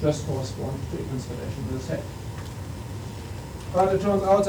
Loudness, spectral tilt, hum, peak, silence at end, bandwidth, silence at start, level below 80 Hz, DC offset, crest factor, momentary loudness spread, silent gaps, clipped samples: -29 LUFS; -6.5 dB/octave; none; -8 dBFS; 0 s; over 20 kHz; 0 s; -42 dBFS; under 0.1%; 18 dB; 14 LU; none; under 0.1%